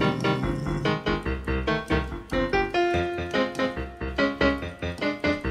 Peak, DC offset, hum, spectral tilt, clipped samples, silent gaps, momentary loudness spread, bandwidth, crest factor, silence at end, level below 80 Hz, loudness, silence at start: -8 dBFS; under 0.1%; none; -6.5 dB/octave; under 0.1%; none; 5 LU; 13.5 kHz; 18 dB; 0 s; -38 dBFS; -26 LUFS; 0 s